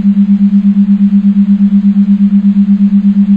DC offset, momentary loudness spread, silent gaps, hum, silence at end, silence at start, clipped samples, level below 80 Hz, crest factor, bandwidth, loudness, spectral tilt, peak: under 0.1%; 1 LU; none; none; 0 s; 0 s; under 0.1%; -44 dBFS; 6 dB; 3.4 kHz; -8 LUFS; -11 dB/octave; 0 dBFS